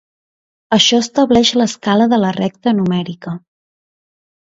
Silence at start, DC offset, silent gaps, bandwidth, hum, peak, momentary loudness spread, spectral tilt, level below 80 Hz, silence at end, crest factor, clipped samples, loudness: 0.7 s; under 0.1%; none; 8 kHz; none; 0 dBFS; 14 LU; -4.5 dB/octave; -52 dBFS; 1.05 s; 16 dB; under 0.1%; -14 LUFS